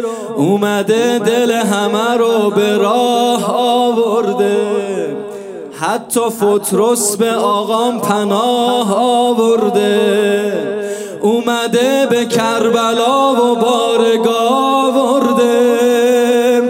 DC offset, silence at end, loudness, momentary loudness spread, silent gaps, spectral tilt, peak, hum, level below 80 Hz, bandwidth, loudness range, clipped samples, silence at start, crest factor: under 0.1%; 0 s; -13 LUFS; 6 LU; none; -4 dB/octave; 0 dBFS; none; -66 dBFS; 16 kHz; 3 LU; under 0.1%; 0 s; 12 dB